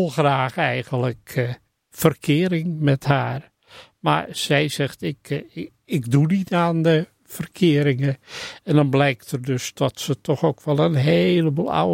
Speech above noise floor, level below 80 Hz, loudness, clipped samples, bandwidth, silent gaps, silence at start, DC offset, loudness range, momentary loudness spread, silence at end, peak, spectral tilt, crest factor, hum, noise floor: 28 dB; -58 dBFS; -21 LUFS; under 0.1%; 16.5 kHz; none; 0 s; under 0.1%; 3 LU; 12 LU; 0 s; -2 dBFS; -6 dB/octave; 20 dB; none; -48 dBFS